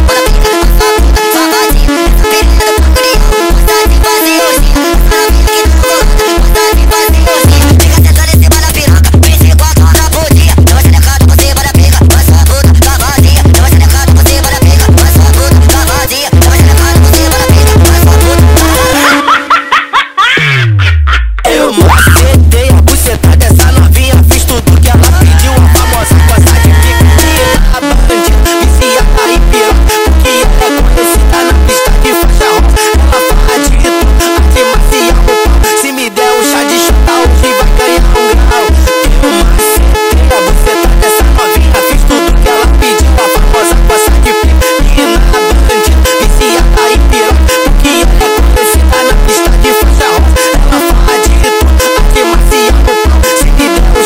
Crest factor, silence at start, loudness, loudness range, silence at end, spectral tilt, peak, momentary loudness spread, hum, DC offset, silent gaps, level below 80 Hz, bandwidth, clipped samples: 4 dB; 0 s; -6 LUFS; 2 LU; 0 s; -4.5 dB/octave; 0 dBFS; 3 LU; none; 1%; none; -8 dBFS; 16.5 kHz; 4%